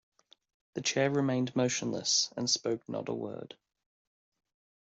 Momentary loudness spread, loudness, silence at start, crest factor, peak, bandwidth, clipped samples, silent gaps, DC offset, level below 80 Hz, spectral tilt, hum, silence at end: 13 LU; -31 LUFS; 0.75 s; 20 dB; -14 dBFS; 8.2 kHz; under 0.1%; none; under 0.1%; -74 dBFS; -3.5 dB/octave; none; 1.3 s